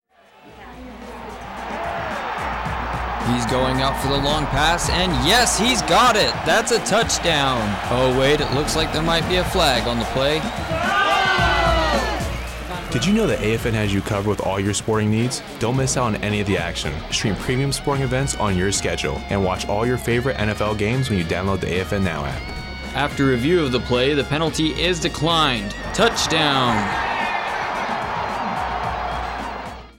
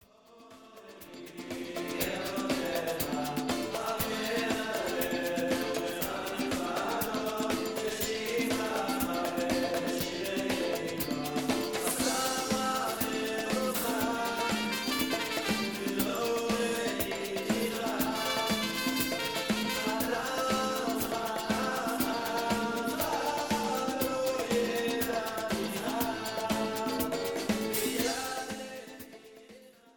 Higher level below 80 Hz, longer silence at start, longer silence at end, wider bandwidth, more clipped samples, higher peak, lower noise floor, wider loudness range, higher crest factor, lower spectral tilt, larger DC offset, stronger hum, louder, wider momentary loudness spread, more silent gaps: first, -34 dBFS vs -58 dBFS; first, 0.45 s vs 0.3 s; about the same, 0.1 s vs 0.05 s; about the same, 19 kHz vs 19.5 kHz; neither; first, -6 dBFS vs -14 dBFS; second, -49 dBFS vs -57 dBFS; first, 5 LU vs 2 LU; about the same, 16 dB vs 18 dB; about the same, -4 dB/octave vs -3 dB/octave; neither; neither; first, -20 LUFS vs -31 LUFS; first, 9 LU vs 4 LU; neither